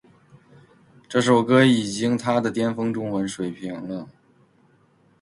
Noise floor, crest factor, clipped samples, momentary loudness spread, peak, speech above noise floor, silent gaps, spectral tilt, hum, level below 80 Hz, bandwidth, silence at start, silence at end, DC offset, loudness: -59 dBFS; 20 dB; under 0.1%; 16 LU; -4 dBFS; 38 dB; none; -5.5 dB/octave; none; -62 dBFS; 11.5 kHz; 1.1 s; 1.1 s; under 0.1%; -22 LUFS